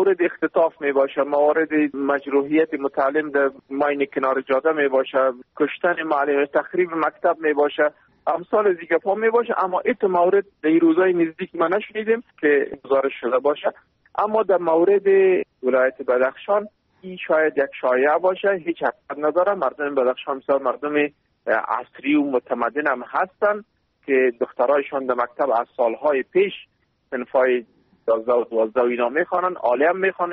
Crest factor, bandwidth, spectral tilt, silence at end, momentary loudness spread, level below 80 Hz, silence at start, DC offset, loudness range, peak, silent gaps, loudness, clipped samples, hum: 14 dB; 4.3 kHz; -3.5 dB/octave; 0 s; 6 LU; -68 dBFS; 0 s; under 0.1%; 3 LU; -6 dBFS; none; -21 LUFS; under 0.1%; none